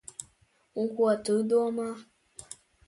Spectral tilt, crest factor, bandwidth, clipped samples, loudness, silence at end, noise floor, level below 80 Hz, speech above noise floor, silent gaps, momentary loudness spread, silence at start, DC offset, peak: -5 dB/octave; 18 dB; 11.5 kHz; under 0.1%; -28 LUFS; 0.35 s; -67 dBFS; -70 dBFS; 39 dB; none; 21 LU; 0.2 s; under 0.1%; -14 dBFS